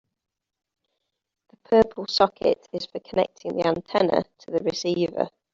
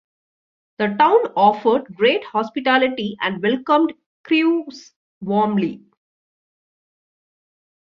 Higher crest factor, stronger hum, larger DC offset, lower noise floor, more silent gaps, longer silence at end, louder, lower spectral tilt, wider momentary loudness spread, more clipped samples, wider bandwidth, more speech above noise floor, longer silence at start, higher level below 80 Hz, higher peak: about the same, 22 dB vs 18 dB; neither; neither; second, -79 dBFS vs under -90 dBFS; second, none vs 4.06-4.24 s, 4.96-5.21 s; second, 0.25 s vs 2.15 s; second, -24 LUFS vs -19 LUFS; second, -5 dB/octave vs -6.5 dB/octave; about the same, 9 LU vs 9 LU; neither; about the same, 7.6 kHz vs 7.2 kHz; second, 55 dB vs over 72 dB; first, 1.7 s vs 0.8 s; first, -58 dBFS vs -66 dBFS; about the same, -4 dBFS vs -2 dBFS